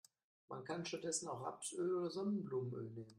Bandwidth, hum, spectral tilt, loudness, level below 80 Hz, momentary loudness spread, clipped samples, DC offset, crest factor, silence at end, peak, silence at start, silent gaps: 13.5 kHz; none; -4.5 dB/octave; -43 LUFS; -84 dBFS; 8 LU; under 0.1%; under 0.1%; 18 dB; 0 s; -26 dBFS; 0.5 s; none